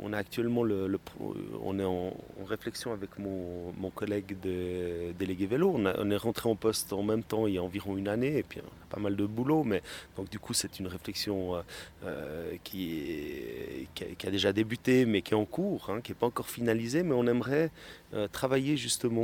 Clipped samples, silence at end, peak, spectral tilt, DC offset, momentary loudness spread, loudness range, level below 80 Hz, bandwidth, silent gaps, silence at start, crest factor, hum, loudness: under 0.1%; 0 s; -12 dBFS; -5 dB/octave; under 0.1%; 12 LU; 6 LU; -60 dBFS; 18.5 kHz; none; 0 s; 20 dB; none; -32 LUFS